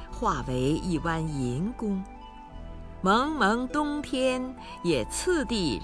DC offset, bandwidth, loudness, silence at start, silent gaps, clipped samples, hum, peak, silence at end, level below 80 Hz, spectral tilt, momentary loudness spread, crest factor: under 0.1%; 11 kHz; -28 LUFS; 0 s; none; under 0.1%; none; -10 dBFS; 0 s; -42 dBFS; -5 dB/octave; 19 LU; 18 dB